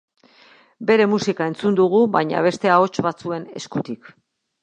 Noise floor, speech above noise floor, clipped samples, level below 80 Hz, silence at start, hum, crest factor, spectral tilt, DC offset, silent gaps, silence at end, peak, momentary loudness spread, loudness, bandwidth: -52 dBFS; 33 dB; under 0.1%; -64 dBFS; 0.8 s; none; 18 dB; -6 dB/octave; under 0.1%; none; 0.65 s; -2 dBFS; 12 LU; -19 LUFS; 9.6 kHz